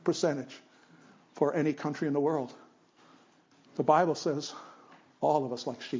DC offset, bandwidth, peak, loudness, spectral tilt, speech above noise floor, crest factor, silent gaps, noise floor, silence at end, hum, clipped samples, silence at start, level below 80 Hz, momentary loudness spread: under 0.1%; 7.6 kHz; -10 dBFS; -30 LUFS; -5.5 dB/octave; 33 dB; 22 dB; none; -63 dBFS; 0 s; none; under 0.1%; 0.05 s; -80 dBFS; 18 LU